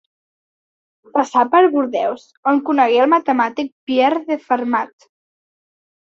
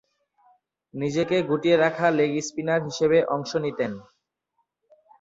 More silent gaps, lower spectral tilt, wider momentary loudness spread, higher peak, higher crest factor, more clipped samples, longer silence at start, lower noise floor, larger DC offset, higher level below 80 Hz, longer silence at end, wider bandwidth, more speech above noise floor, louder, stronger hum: first, 2.37-2.43 s, 3.72-3.87 s vs none; about the same, -4.5 dB/octave vs -5.5 dB/octave; about the same, 9 LU vs 10 LU; first, -2 dBFS vs -8 dBFS; about the same, 16 dB vs 18 dB; neither; first, 1.15 s vs 0.95 s; first, under -90 dBFS vs -75 dBFS; neither; about the same, -68 dBFS vs -66 dBFS; about the same, 1.25 s vs 1.2 s; about the same, 7.6 kHz vs 7.8 kHz; first, over 74 dB vs 52 dB; first, -17 LUFS vs -24 LUFS; neither